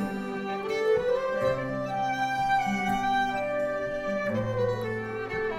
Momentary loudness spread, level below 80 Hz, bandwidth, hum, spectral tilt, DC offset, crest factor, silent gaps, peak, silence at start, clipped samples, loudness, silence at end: 6 LU; -52 dBFS; 16 kHz; none; -6 dB/octave; under 0.1%; 14 dB; none; -14 dBFS; 0 s; under 0.1%; -28 LUFS; 0 s